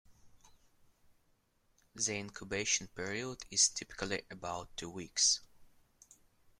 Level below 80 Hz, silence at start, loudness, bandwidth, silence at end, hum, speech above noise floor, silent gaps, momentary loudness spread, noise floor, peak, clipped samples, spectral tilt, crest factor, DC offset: -64 dBFS; 0.1 s; -34 LUFS; 16 kHz; 0.9 s; none; 37 dB; none; 13 LU; -74 dBFS; -14 dBFS; under 0.1%; -1 dB/octave; 24 dB; under 0.1%